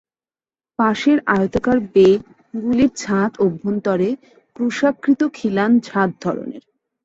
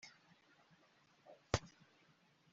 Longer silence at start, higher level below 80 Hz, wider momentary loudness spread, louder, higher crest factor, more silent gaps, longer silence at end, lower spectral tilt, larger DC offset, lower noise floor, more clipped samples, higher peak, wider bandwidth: first, 0.8 s vs 0.05 s; first, -52 dBFS vs -62 dBFS; second, 10 LU vs 25 LU; first, -18 LUFS vs -43 LUFS; second, 16 dB vs 34 dB; neither; second, 0.45 s vs 0.85 s; first, -6.5 dB/octave vs -4 dB/octave; neither; first, under -90 dBFS vs -73 dBFS; neither; first, -2 dBFS vs -16 dBFS; about the same, 8 kHz vs 7.6 kHz